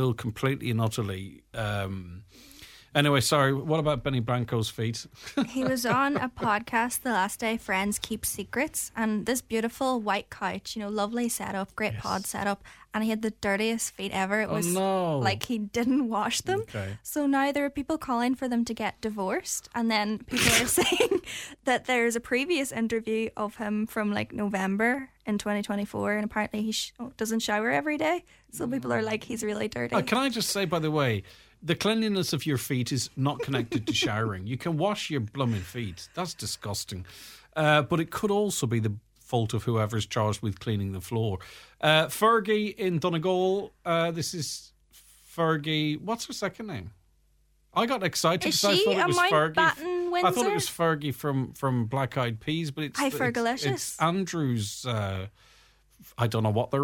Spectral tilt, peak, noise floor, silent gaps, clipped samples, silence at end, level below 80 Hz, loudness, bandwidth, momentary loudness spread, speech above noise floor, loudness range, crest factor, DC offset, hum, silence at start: -4.5 dB/octave; -4 dBFS; -65 dBFS; none; under 0.1%; 0 s; -56 dBFS; -28 LUFS; 17.5 kHz; 10 LU; 38 dB; 4 LU; 24 dB; under 0.1%; none; 0 s